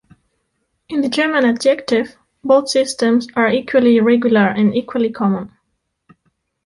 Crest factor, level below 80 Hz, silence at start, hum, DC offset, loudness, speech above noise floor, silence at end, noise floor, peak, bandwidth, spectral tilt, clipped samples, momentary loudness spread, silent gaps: 14 dB; -58 dBFS; 0.9 s; none; under 0.1%; -16 LUFS; 56 dB; 1.2 s; -71 dBFS; -2 dBFS; 11.5 kHz; -5 dB/octave; under 0.1%; 9 LU; none